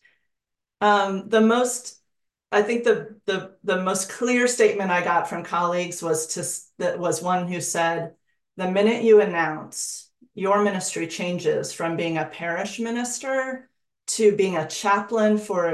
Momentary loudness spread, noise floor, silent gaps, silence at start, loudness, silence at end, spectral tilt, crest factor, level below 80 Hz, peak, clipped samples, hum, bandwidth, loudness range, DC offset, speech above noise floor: 10 LU; -83 dBFS; none; 0.8 s; -23 LUFS; 0 s; -4 dB/octave; 18 dB; -72 dBFS; -6 dBFS; under 0.1%; none; 12.5 kHz; 3 LU; under 0.1%; 61 dB